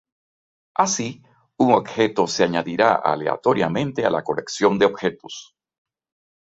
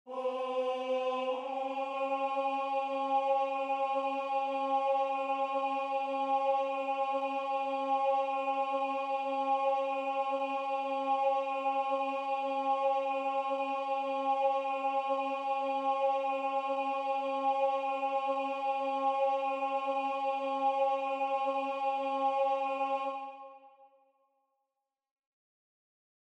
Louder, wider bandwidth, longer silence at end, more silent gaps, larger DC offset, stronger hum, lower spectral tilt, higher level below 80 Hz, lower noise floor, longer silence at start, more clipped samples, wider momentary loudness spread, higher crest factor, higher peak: first, -20 LUFS vs -32 LUFS; about the same, 8 kHz vs 8.4 kHz; second, 1.05 s vs 2.4 s; neither; neither; neither; first, -4.5 dB/octave vs -2.5 dB/octave; first, -60 dBFS vs under -90 dBFS; about the same, under -90 dBFS vs -88 dBFS; first, 0.8 s vs 0.05 s; neither; first, 9 LU vs 4 LU; first, 20 dB vs 12 dB; first, -2 dBFS vs -20 dBFS